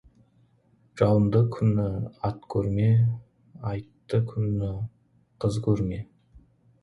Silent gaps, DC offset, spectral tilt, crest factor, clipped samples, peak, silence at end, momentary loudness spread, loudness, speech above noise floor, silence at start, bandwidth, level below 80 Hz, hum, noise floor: none; under 0.1%; -9.5 dB/octave; 18 dB; under 0.1%; -8 dBFS; 0.8 s; 15 LU; -26 LUFS; 39 dB; 0.95 s; 10.5 kHz; -48 dBFS; none; -63 dBFS